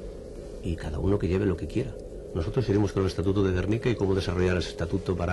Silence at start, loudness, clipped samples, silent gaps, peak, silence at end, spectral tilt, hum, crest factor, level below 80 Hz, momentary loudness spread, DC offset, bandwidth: 0 s; -28 LUFS; under 0.1%; none; -14 dBFS; 0 s; -7.5 dB/octave; none; 14 dB; -40 dBFS; 11 LU; under 0.1%; 11.5 kHz